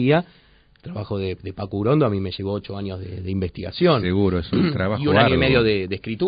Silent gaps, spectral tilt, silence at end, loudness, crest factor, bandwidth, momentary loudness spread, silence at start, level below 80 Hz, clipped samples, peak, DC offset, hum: none; -11.5 dB/octave; 0 s; -21 LUFS; 18 dB; 5.2 kHz; 14 LU; 0 s; -44 dBFS; under 0.1%; -2 dBFS; under 0.1%; none